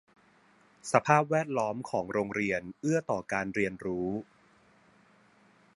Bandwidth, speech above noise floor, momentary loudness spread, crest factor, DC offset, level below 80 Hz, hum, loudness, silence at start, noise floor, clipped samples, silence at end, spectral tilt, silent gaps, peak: 11.5 kHz; 33 dB; 9 LU; 26 dB; under 0.1%; -66 dBFS; none; -30 LUFS; 0.85 s; -63 dBFS; under 0.1%; 1.55 s; -6 dB/octave; none; -6 dBFS